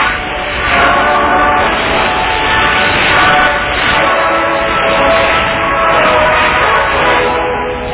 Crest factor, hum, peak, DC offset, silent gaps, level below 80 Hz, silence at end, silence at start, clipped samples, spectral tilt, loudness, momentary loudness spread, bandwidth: 10 dB; none; 0 dBFS; under 0.1%; none; -28 dBFS; 0 s; 0 s; under 0.1%; -7.5 dB/octave; -10 LUFS; 4 LU; 4 kHz